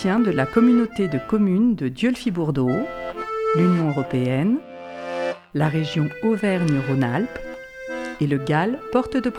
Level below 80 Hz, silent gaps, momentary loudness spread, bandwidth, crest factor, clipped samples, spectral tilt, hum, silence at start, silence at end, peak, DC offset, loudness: -50 dBFS; none; 12 LU; 11 kHz; 16 dB; under 0.1%; -7.5 dB/octave; none; 0 s; 0 s; -4 dBFS; under 0.1%; -22 LUFS